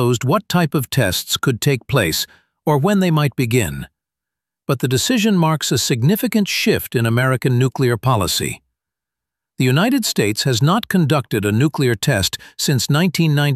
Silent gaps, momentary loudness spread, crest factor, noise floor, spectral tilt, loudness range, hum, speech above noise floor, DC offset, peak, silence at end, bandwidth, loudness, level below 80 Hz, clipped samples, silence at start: none; 6 LU; 16 dB; -85 dBFS; -5 dB/octave; 2 LU; none; 68 dB; under 0.1%; -2 dBFS; 0 s; 15.5 kHz; -17 LUFS; -48 dBFS; under 0.1%; 0 s